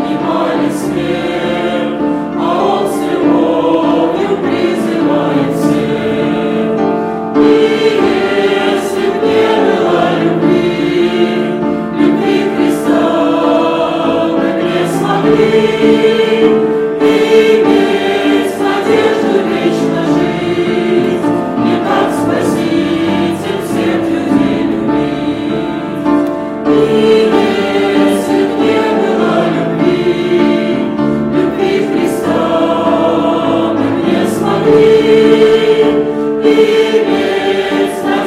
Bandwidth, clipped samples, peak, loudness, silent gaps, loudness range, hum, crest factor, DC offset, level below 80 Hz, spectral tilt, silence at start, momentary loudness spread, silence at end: 14.5 kHz; under 0.1%; 0 dBFS; -12 LUFS; none; 3 LU; none; 10 dB; under 0.1%; -44 dBFS; -6 dB/octave; 0 s; 6 LU; 0 s